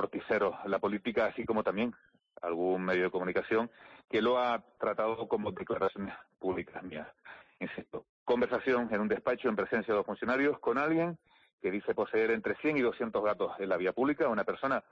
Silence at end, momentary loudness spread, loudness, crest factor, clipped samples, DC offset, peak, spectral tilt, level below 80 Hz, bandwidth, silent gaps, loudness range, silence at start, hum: 0.1 s; 12 LU; -32 LUFS; 12 dB; under 0.1%; under 0.1%; -20 dBFS; -7.5 dB/octave; -68 dBFS; 6.8 kHz; 8.09-8.26 s, 11.53-11.58 s; 5 LU; 0 s; none